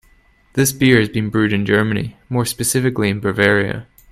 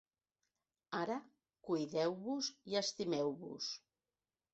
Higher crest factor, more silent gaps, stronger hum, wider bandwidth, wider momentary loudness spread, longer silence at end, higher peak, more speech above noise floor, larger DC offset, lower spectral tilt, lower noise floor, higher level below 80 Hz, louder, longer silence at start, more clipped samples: about the same, 18 dB vs 18 dB; neither; neither; first, 15 kHz vs 8 kHz; about the same, 10 LU vs 8 LU; second, 0.3 s vs 0.75 s; first, 0 dBFS vs -24 dBFS; second, 36 dB vs over 50 dB; neither; first, -5 dB/octave vs -3.5 dB/octave; second, -53 dBFS vs under -90 dBFS; first, -46 dBFS vs -84 dBFS; first, -17 LUFS vs -40 LUFS; second, 0.55 s vs 0.9 s; neither